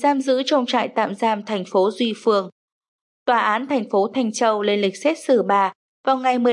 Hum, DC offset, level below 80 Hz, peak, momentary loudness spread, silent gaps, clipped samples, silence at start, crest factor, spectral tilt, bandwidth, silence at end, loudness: none; under 0.1%; -82 dBFS; -6 dBFS; 4 LU; 2.52-2.81 s, 2.88-3.26 s, 5.75-6.04 s; under 0.1%; 0 s; 14 dB; -4.5 dB/octave; 11.5 kHz; 0 s; -20 LUFS